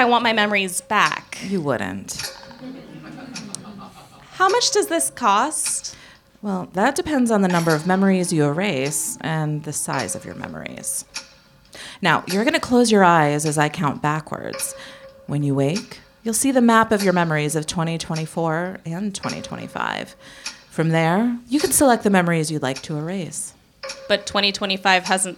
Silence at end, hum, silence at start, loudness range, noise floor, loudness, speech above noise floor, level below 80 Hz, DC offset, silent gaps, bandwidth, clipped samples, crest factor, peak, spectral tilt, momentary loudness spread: 0 s; none; 0 s; 6 LU; -50 dBFS; -20 LUFS; 29 dB; -56 dBFS; under 0.1%; none; 17.5 kHz; under 0.1%; 20 dB; -2 dBFS; -4 dB/octave; 18 LU